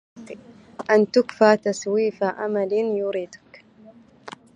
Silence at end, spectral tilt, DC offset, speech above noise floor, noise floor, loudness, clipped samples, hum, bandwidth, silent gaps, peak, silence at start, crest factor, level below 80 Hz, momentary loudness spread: 0.25 s; -5 dB/octave; under 0.1%; 29 dB; -50 dBFS; -21 LUFS; under 0.1%; none; 9.4 kHz; none; -2 dBFS; 0.15 s; 22 dB; -70 dBFS; 23 LU